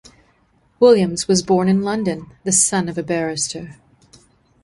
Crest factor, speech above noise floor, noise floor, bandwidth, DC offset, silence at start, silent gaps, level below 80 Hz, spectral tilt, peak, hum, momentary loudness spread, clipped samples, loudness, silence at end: 18 dB; 42 dB; -59 dBFS; 11.5 kHz; under 0.1%; 0.8 s; none; -54 dBFS; -4 dB/octave; -2 dBFS; none; 11 LU; under 0.1%; -17 LUFS; 0.9 s